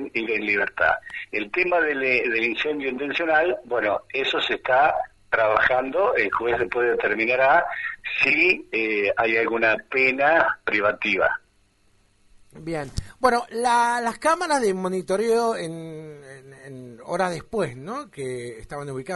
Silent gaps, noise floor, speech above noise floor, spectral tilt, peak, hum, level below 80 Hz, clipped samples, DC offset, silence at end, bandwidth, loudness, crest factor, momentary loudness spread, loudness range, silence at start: none; -61 dBFS; 39 dB; -4 dB/octave; -2 dBFS; none; -52 dBFS; under 0.1%; under 0.1%; 0 s; 11.5 kHz; -22 LUFS; 22 dB; 14 LU; 6 LU; 0 s